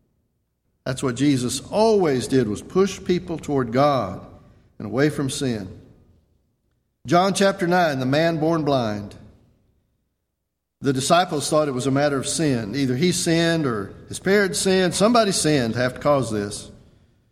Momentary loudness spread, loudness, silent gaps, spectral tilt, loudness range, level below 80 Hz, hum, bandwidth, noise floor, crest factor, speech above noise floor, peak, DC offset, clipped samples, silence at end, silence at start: 11 LU; -21 LUFS; none; -5 dB/octave; 5 LU; -52 dBFS; none; 16 kHz; -79 dBFS; 18 dB; 58 dB; -4 dBFS; under 0.1%; under 0.1%; 0.6 s; 0.85 s